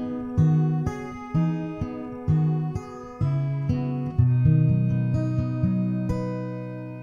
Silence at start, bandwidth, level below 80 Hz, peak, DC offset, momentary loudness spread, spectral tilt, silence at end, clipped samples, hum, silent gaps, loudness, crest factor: 0 s; 7 kHz; -44 dBFS; -8 dBFS; under 0.1%; 12 LU; -10 dB/octave; 0 s; under 0.1%; none; none; -25 LUFS; 16 dB